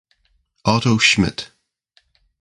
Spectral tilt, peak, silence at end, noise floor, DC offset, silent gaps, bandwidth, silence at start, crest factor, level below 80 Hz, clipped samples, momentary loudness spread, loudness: -4 dB/octave; 0 dBFS; 0.95 s; -64 dBFS; under 0.1%; none; 11.5 kHz; 0.65 s; 20 dB; -44 dBFS; under 0.1%; 17 LU; -16 LUFS